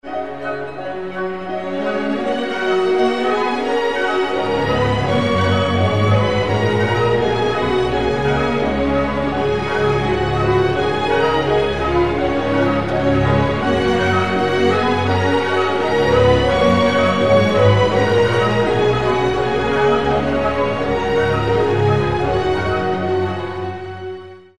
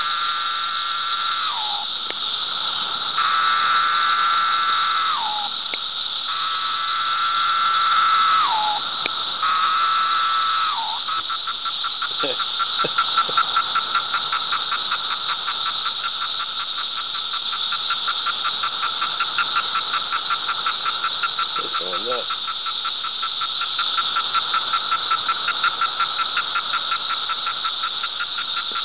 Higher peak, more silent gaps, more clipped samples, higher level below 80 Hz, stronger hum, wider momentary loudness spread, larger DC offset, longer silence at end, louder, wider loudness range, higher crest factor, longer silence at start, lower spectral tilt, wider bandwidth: about the same, -2 dBFS vs -2 dBFS; neither; neither; first, -36 dBFS vs -66 dBFS; neither; first, 8 LU vs 5 LU; first, 2% vs 0.5%; about the same, 0 s vs 0 s; first, -17 LUFS vs -20 LUFS; about the same, 4 LU vs 3 LU; about the same, 16 dB vs 20 dB; about the same, 0 s vs 0 s; first, -6.5 dB/octave vs -4 dB/octave; first, 11.5 kHz vs 4 kHz